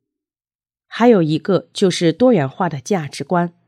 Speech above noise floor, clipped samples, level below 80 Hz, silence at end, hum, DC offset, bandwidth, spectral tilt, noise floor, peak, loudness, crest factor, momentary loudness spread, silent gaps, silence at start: over 74 dB; under 0.1%; -66 dBFS; 0.2 s; none; under 0.1%; 13 kHz; -6 dB/octave; under -90 dBFS; 0 dBFS; -17 LUFS; 16 dB; 8 LU; none; 0.9 s